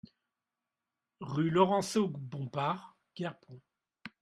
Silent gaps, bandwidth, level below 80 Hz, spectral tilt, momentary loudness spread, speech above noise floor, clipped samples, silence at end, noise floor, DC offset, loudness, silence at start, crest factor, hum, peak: none; 13.5 kHz; -74 dBFS; -6 dB/octave; 24 LU; 58 dB; under 0.1%; 0.15 s; -90 dBFS; under 0.1%; -33 LUFS; 1.2 s; 24 dB; none; -12 dBFS